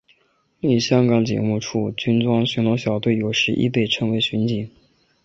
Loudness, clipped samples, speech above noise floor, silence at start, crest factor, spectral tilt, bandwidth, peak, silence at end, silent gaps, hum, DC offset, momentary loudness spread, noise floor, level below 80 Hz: -20 LUFS; under 0.1%; 44 dB; 0.65 s; 18 dB; -6 dB/octave; 7.6 kHz; -4 dBFS; 0.55 s; none; none; under 0.1%; 7 LU; -63 dBFS; -54 dBFS